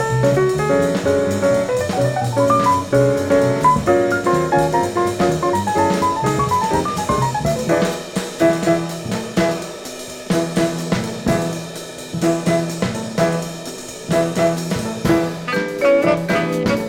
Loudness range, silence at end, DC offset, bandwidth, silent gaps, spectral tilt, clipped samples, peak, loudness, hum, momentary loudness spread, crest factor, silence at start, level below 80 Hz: 5 LU; 0 s; under 0.1%; 18.5 kHz; none; -5.5 dB/octave; under 0.1%; -2 dBFS; -18 LUFS; none; 9 LU; 16 dB; 0 s; -42 dBFS